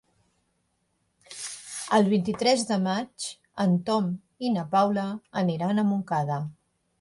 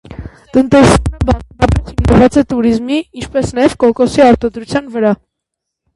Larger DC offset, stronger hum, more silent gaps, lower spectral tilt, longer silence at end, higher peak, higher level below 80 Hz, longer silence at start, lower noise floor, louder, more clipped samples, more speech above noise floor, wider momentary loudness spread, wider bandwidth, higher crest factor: neither; neither; neither; about the same, -5.5 dB/octave vs -6.5 dB/octave; second, 0.5 s vs 0.8 s; second, -8 dBFS vs 0 dBFS; second, -68 dBFS vs -24 dBFS; first, 1.3 s vs 0.1 s; second, -73 dBFS vs -77 dBFS; second, -26 LUFS vs -12 LUFS; second, under 0.1% vs 0.1%; second, 48 dB vs 66 dB; first, 13 LU vs 10 LU; about the same, 11.5 kHz vs 11.5 kHz; first, 20 dB vs 12 dB